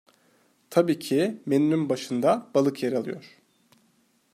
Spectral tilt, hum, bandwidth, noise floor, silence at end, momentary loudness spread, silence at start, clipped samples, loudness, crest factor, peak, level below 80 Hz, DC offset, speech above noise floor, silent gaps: -6.5 dB/octave; none; 15 kHz; -66 dBFS; 1.05 s; 6 LU; 0.7 s; under 0.1%; -25 LUFS; 20 dB; -6 dBFS; -74 dBFS; under 0.1%; 42 dB; none